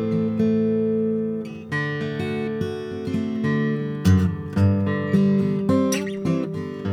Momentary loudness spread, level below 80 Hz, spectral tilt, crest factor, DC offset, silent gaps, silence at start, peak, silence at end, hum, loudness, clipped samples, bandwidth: 8 LU; -50 dBFS; -7 dB/octave; 16 dB; under 0.1%; none; 0 s; -6 dBFS; 0 s; none; -23 LUFS; under 0.1%; 13.5 kHz